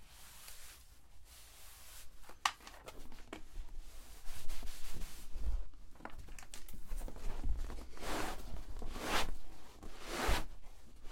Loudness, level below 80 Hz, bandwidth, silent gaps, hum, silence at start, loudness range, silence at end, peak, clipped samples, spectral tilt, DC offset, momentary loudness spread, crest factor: -45 LUFS; -44 dBFS; 16.5 kHz; none; none; 0 s; 8 LU; 0 s; -14 dBFS; under 0.1%; -3 dB/octave; under 0.1%; 19 LU; 24 dB